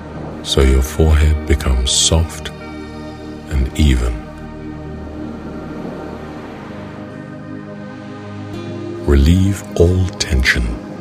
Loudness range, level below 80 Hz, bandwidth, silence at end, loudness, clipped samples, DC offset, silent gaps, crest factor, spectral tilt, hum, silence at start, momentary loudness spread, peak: 13 LU; -20 dBFS; 15 kHz; 0 s; -16 LUFS; under 0.1%; under 0.1%; none; 18 dB; -4.5 dB/octave; none; 0 s; 17 LU; 0 dBFS